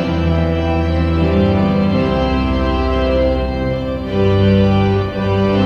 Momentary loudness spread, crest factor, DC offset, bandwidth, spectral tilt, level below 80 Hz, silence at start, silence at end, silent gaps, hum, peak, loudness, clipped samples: 5 LU; 12 dB; under 0.1%; 6.6 kHz; -8.5 dB/octave; -24 dBFS; 0 s; 0 s; none; none; -2 dBFS; -16 LUFS; under 0.1%